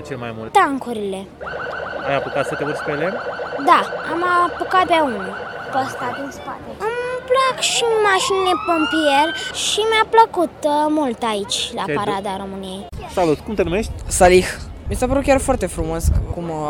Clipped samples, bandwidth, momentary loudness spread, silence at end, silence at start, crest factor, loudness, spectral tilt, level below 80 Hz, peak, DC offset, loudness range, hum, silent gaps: under 0.1%; 18 kHz; 13 LU; 0 s; 0 s; 18 dB; -19 LUFS; -4 dB/octave; -34 dBFS; 0 dBFS; under 0.1%; 5 LU; none; none